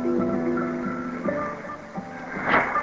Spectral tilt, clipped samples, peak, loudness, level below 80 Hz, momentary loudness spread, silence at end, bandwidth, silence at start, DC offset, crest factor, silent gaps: -7 dB/octave; under 0.1%; -6 dBFS; -27 LUFS; -54 dBFS; 13 LU; 0 s; 7.6 kHz; 0 s; under 0.1%; 20 dB; none